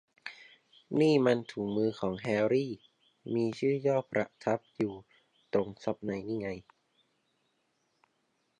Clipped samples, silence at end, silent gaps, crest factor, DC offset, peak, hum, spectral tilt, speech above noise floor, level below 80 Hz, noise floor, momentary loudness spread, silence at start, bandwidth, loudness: under 0.1%; 2 s; none; 20 dB; under 0.1%; -14 dBFS; none; -7 dB/octave; 46 dB; -68 dBFS; -76 dBFS; 19 LU; 0.25 s; 10 kHz; -32 LUFS